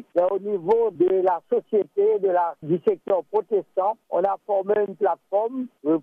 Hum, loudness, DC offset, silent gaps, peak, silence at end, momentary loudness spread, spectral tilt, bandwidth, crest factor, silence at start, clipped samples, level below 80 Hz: none; -23 LUFS; under 0.1%; none; -10 dBFS; 0 s; 5 LU; -9.5 dB/octave; 3.8 kHz; 12 dB; 0.15 s; under 0.1%; -74 dBFS